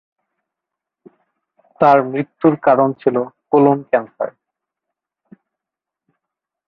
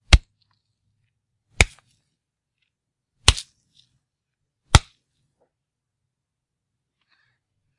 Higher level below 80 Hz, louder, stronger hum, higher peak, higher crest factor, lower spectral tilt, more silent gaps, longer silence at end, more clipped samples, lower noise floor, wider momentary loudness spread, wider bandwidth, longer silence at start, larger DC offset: second, -64 dBFS vs -30 dBFS; first, -16 LUFS vs -20 LUFS; neither; about the same, -2 dBFS vs 0 dBFS; second, 18 dB vs 26 dB; first, -10 dB/octave vs -3 dB/octave; neither; second, 2.4 s vs 3 s; neither; about the same, -86 dBFS vs -83 dBFS; first, 11 LU vs 2 LU; second, 5.8 kHz vs 12 kHz; first, 1.8 s vs 0.1 s; neither